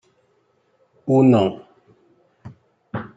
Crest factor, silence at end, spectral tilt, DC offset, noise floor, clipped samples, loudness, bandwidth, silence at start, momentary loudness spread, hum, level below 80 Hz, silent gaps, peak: 20 dB; 0.1 s; -9 dB/octave; under 0.1%; -64 dBFS; under 0.1%; -17 LUFS; 7.8 kHz; 1.05 s; 20 LU; none; -64 dBFS; none; -4 dBFS